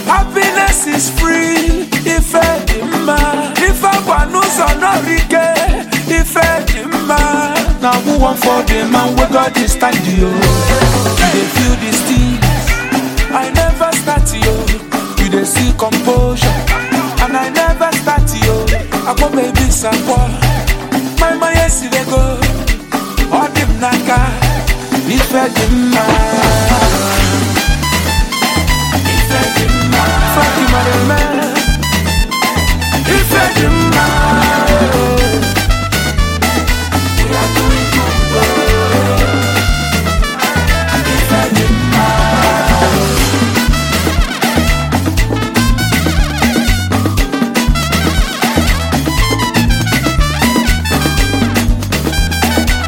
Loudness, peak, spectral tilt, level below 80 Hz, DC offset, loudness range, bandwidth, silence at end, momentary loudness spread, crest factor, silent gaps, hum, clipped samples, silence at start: -12 LUFS; 0 dBFS; -4.5 dB/octave; -16 dBFS; under 0.1%; 2 LU; 17 kHz; 0 s; 4 LU; 12 dB; none; none; under 0.1%; 0 s